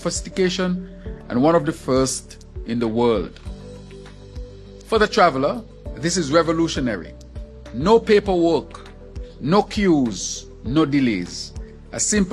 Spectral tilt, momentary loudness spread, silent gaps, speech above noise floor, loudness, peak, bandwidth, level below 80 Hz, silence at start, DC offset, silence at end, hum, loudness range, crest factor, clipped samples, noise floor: -4.5 dB/octave; 21 LU; none; 20 dB; -20 LUFS; 0 dBFS; 12.5 kHz; -38 dBFS; 0 s; under 0.1%; 0 s; none; 3 LU; 20 dB; under 0.1%; -39 dBFS